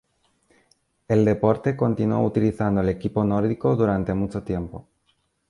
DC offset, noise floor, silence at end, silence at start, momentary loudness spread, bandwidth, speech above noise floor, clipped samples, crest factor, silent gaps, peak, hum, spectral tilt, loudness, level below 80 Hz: under 0.1%; -69 dBFS; 0.7 s; 1.1 s; 8 LU; 11 kHz; 47 dB; under 0.1%; 18 dB; none; -4 dBFS; none; -9.5 dB/octave; -23 LUFS; -46 dBFS